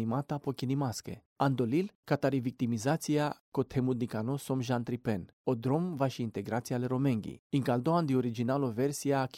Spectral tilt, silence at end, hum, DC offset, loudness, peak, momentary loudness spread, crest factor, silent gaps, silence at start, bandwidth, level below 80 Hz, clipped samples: -6.5 dB/octave; 0 s; none; under 0.1%; -32 LUFS; -14 dBFS; 6 LU; 18 dB; 1.26-1.36 s, 1.95-2.03 s, 3.40-3.52 s, 5.33-5.44 s, 7.39-7.50 s; 0 s; 16 kHz; -66 dBFS; under 0.1%